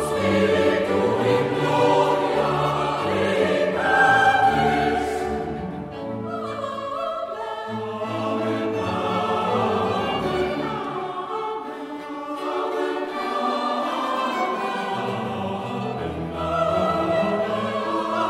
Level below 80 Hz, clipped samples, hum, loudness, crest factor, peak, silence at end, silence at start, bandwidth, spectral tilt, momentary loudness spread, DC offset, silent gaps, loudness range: -50 dBFS; under 0.1%; none; -23 LUFS; 18 dB; -6 dBFS; 0 s; 0 s; 16 kHz; -5.5 dB/octave; 11 LU; under 0.1%; none; 8 LU